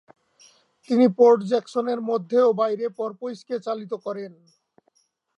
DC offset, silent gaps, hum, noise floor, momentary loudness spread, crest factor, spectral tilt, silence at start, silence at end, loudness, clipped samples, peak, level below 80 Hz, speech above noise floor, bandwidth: under 0.1%; none; none; -68 dBFS; 15 LU; 20 dB; -7 dB/octave; 0.9 s; 1.1 s; -22 LUFS; under 0.1%; -4 dBFS; -84 dBFS; 46 dB; 8.6 kHz